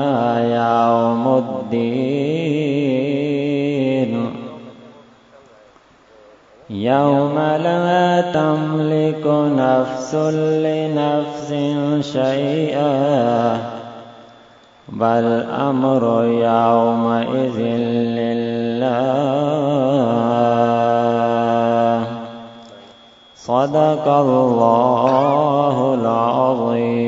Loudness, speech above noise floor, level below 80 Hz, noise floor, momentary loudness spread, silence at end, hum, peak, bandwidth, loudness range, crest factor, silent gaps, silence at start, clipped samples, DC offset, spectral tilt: -17 LUFS; 33 dB; -62 dBFS; -49 dBFS; 7 LU; 0 s; none; 0 dBFS; 7.8 kHz; 5 LU; 18 dB; none; 0 s; under 0.1%; under 0.1%; -7.5 dB/octave